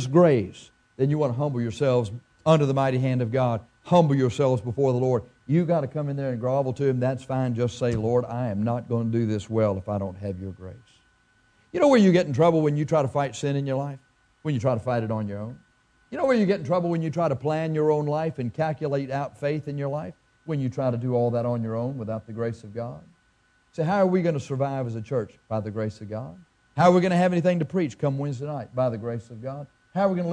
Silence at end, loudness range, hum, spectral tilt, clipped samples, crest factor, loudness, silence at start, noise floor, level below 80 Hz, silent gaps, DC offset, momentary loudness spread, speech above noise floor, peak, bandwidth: 0 s; 5 LU; none; -8 dB/octave; under 0.1%; 20 dB; -25 LUFS; 0 s; -64 dBFS; -60 dBFS; none; under 0.1%; 14 LU; 40 dB; -4 dBFS; 10 kHz